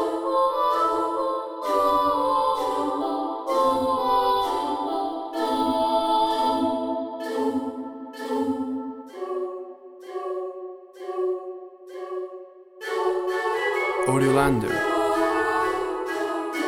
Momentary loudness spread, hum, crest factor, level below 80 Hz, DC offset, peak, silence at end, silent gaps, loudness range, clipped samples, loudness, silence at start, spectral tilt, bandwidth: 14 LU; none; 18 dB; -54 dBFS; under 0.1%; -6 dBFS; 0 s; none; 9 LU; under 0.1%; -24 LUFS; 0 s; -5 dB/octave; 19 kHz